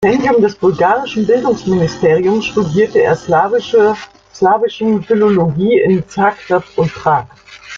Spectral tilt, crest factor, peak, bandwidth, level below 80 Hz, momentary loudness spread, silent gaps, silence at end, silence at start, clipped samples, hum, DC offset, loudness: -7 dB/octave; 12 dB; 0 dBFS; 7.6 kHz; -48 dBFS; 4 LU; none; 0 s; 0 s; under 0.1%; none; under 0.1%; -13 LUFS